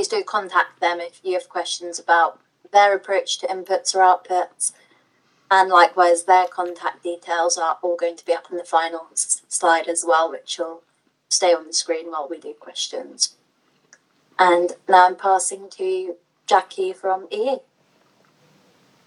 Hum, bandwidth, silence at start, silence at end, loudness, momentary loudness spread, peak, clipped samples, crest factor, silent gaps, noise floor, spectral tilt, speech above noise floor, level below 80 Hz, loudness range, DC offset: none; 12 kHz; 0 s; 1.5 s; -20 LUFS; 13 LU; 0 dBFS; under 0.1%; 20 dB; none; -63 dBFS; -0.5 dB/octave; 43 dB; -90 dBFS; 5 LU; under 0.1%